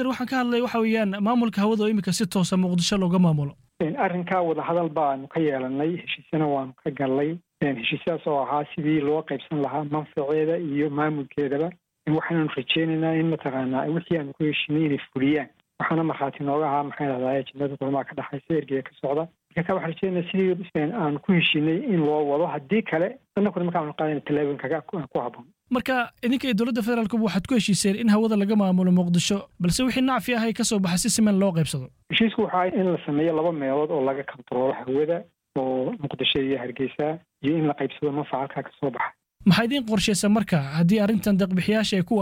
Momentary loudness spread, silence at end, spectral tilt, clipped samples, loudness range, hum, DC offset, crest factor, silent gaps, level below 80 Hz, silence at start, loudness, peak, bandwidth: 8 LU; 0 s; -5.5 dB/octave; under 0.1%; 4 LU; none; under 0.1%; 16 dB; none; -56 dBFS; 0 s; -24 LUFS; -8 dBFS; 16 kHz